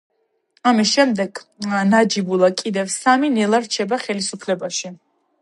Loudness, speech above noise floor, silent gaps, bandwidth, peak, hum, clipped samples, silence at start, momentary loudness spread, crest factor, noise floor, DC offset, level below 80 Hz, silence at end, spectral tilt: -18 LUFS; 45 dB; none; 11.5 kHz; -2 dBFS; none; under 0.1%; 0.65 s; 9 LU; 18 dB; -63 dBFS; under 0.1%; -70 dBFS; 0.45 s; -4 dB/octave